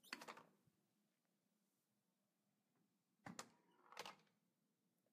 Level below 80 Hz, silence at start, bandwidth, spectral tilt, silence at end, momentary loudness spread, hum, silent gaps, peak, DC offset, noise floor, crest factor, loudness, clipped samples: under -90 dBFS; 0.05 s; 15 kHz; -2.5 dB/octave; 0.85 s; 8 LU; none; none; -30 dBFS; under 0.1%; -89 dBFS; 36 dB; -59 LUFS; under 0.1%